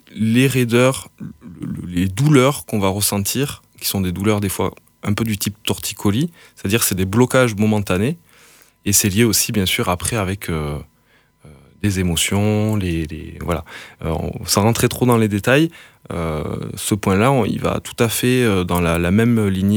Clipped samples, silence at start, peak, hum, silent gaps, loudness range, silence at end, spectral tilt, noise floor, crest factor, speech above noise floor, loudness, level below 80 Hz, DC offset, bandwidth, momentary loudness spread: under 0.1%; 0.1 s; -2 dBFS; none; none; 4 LU; 0 s; -5 dB/octave; -57 dBFS; 18 dB; 39 dB; -18 LUFS; -40 dBFS; under 0.1%; over 20 kHz; 11 LU